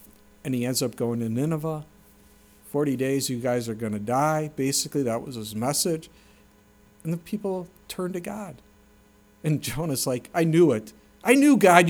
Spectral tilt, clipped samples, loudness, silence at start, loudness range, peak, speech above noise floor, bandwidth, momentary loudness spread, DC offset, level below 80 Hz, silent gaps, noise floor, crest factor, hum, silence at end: -5 dB/octave; under 0.1%; -25 LUFS; 0.45 s; 7 LU; -2 dBFS; 33 dB; over 20 kHz; 14 LU; under 0.1%; -58 dBFS; none; -57 dBFS; 24 dB; none; 0 s